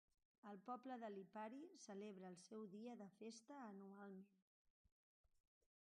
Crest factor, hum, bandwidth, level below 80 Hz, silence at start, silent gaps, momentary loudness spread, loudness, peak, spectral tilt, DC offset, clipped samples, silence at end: 18 dB; none; 10.5 kHz; under -90 dBFS; 0.45 s; 4.42-4.85 s, 4.92-5.24 s; 6 LU; -58 LUFS; -42 dBFS; -5.5 dB/octave; under 0.1%; under 0.1%; 0.4 s